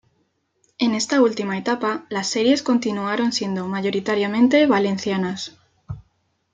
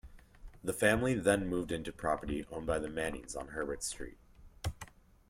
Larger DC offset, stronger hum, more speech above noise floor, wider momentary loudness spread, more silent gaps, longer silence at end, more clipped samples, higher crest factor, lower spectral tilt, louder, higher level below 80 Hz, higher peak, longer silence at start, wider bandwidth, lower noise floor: neither; neither; first, 48 dB vs 20 dB; about the same, 13 LU vs 13 LU; neither; about the same, 0.5 s vs 0.4 s; neither; second, 16 dB vs 22 dB; about the same, -4.5 dB/octave vs -4.5 dB/octave; first, -20 LUFS vs -35 LUFS; second, -60 dBFS vs -52 dBFS; first, -4 dBFS vs -14 dBFS; first, 0.8 s vs 0.05 s; second, 9.4 kHz vs 16 kHz; first, -68 dBFS vs -54 dBFS